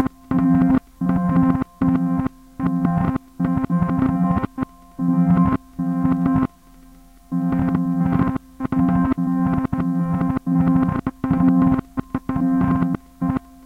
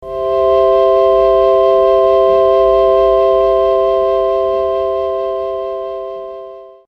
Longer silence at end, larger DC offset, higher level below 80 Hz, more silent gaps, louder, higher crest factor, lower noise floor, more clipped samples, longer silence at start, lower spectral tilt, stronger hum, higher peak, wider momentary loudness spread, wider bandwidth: about the same, 0.25 s vs 0.2 s; neither; about the same, -40 dBFS vs -38 dBFS; neither; second, -20 LUFS vs -12 LUFS; about the same, 16 dB vs 12 dB; first, -47 dBFS vs -32 dBFS; neither; about the same, 0 s vs 0 s; first, -10 dB/octave vs -7 dB/octave; neither; about the same, -4 dBFS vs -2 dBFS; second, 8 LU vs 12 LU; second, 4.1 kHz vs 5.8 kHz